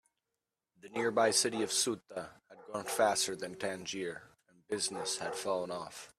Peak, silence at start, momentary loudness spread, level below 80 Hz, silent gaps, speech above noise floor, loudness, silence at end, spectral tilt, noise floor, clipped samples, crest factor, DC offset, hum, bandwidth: -14 dBFS; 0.85 s; 14 LU; -76 dBFS; none; 55 dB; -34 LUFS; 0.1 s; -2 dB/octave; -89 dBFS; under 0.1%; 22 dB; under 0.1%; none; 15 kHz